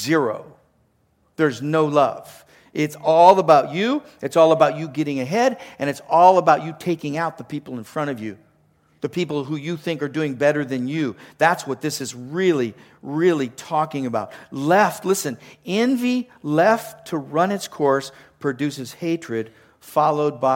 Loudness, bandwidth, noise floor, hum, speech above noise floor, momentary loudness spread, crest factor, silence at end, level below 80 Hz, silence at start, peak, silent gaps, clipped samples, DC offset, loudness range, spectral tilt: -20 LUFS; 17 kHz; -63 dBFS; none; 43 dB; 14 LU; 20 dB; 0 s; -68 dBFS; 0 s; 0 dBFS; none; under 0.1%; under 0.1%; 7 LU; -5.5 dB/octave